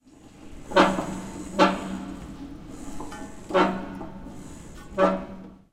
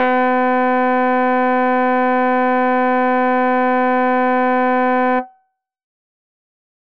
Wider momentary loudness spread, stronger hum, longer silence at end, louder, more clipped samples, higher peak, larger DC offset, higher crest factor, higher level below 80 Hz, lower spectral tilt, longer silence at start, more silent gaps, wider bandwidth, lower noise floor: first, 21 LU vs 0 LU; neither; second, 0.15 s vs 1.05 s; second, -25 LUFS vs -16 LUFS; neither; about the same, -4 dBFS vs -4 dBFS; second, under 0.1% vs 2%; first, 24 dB vs 12 dB; first, -46 dBFS vs -66 dBFS; about the same, -5.5 dB/octave vs -6.5 dB/octave; first, 0.25 s vs 0 s; neither; first, 14.5 kHz vs 5.4 kHz; second, -47 dBFS vs -63 dBFS